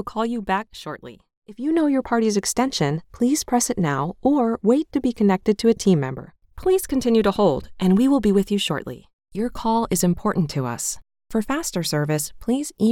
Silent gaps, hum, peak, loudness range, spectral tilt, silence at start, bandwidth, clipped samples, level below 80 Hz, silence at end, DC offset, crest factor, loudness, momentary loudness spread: 1.37-1.42 s, 9.13-9.19 s; none; -6 dBFS; 3 LU; -5 dB/octave; 0 s; 17.5 kHz; under 0.1%; -46 dBFS; 0 s; under 0.1%; 16 dB; -21 LUFS; 10 LU